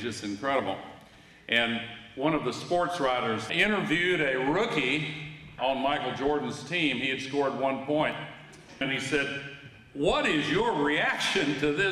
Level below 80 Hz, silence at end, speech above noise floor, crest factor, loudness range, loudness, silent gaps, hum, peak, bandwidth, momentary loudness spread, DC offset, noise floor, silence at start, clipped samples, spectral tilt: -56 dBFS; 0 s; 25 dB; 18 dB; 3 LU; -28 LUFS; none; none; -10 dBFS; 13 kHz; 13 LU; under 0.1%; -53 dBFS; 0 s; under 0.1%; -4.5 dB/octave